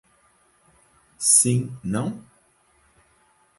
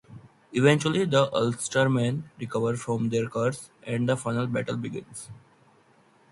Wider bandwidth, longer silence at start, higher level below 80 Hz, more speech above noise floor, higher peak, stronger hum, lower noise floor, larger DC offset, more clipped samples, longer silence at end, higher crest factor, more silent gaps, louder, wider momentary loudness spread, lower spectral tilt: about the same, 12 kHz vs 11.5 kHz; first, 1.2 s vs 0.1 s; about the same, -60 dBFS vs -64 dBFS; first, 40 dB vs 34 dB; first, -2 dBFS vs -6 dBFS; neither; about the same, -62 dBFS vs -60 dBFS; neither; neither; first, 1.4 s vs 1 s; about the same, 24 dB vs 20 dB; neither; first, -20 LUFS vs -26 LUFS; first, 16 LU vs 13 LU; second, -3.5 dB/octave vs -5.5 dB/octave